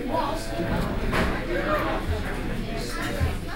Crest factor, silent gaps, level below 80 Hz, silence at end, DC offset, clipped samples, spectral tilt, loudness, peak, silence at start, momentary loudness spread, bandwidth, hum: 16 dB; none; -32 dBFS; 0 s; under 0.1%; under 0.1%; -5.5 dB/octave; -28 LUFS; -10 dBFS; 0 s; 6 LU; 16.5 kHz; none